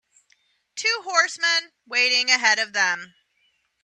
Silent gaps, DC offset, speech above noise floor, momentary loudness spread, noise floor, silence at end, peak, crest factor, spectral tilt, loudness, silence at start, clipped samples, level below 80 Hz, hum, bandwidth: none; under 0.1%; 46 dB; 8 LU; -68 dBFS; 0.8 s; -4 dBFS; 22 dB; 1.5 dB/octave; -20 LUFS; 0.75 s; under 0.1%; -82 dBFS; none; 11.5 kHz